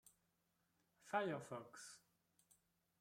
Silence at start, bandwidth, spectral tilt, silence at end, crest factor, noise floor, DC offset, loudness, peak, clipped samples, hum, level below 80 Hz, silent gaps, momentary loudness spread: 0.05 s; 16 kHz; -4.5 dB/octave; 1 s; 24 dB; -85 dBFS; under 0.1%; -47 LUFS; -28 dBFS; under 0.1%; none; under -90 dBFS; none; 16 LU